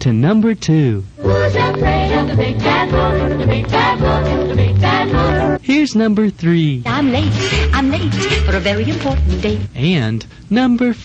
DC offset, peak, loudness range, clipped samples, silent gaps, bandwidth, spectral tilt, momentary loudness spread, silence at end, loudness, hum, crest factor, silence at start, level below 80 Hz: under 0.1%; 0 dBFS; 2 LU; under 0.1%; none; 8.4 kHz; -6.5 dB/octave; 4 LU; 0 s; -15 LUFS; none; 14 dB; 0 s; -24 dBFS